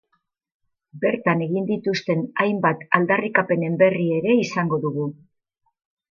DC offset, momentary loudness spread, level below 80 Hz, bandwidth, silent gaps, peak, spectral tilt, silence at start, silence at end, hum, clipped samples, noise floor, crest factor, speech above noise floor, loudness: under 0.1%; 6 LU; -70 dBFS; 7.2 kHz; none; 0 dBFS; -7 dB/octave; 0.95 s; 1 s; none; under 0.1%; -73 dBFS; 22 dB; 52 dB; -21 LUFS